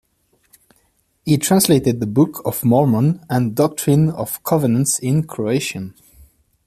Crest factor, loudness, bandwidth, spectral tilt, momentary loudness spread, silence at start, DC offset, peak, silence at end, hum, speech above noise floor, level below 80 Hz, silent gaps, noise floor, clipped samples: 16 dB; -17 LUFS; 15 kHz; -5.5 dB/octave; 7 LU; 1.25 s; under 0.1%; -2 dBFS; 0.75 s; none; 46 dB; -52 dBFS; none; -62 dBFS; under 0.1%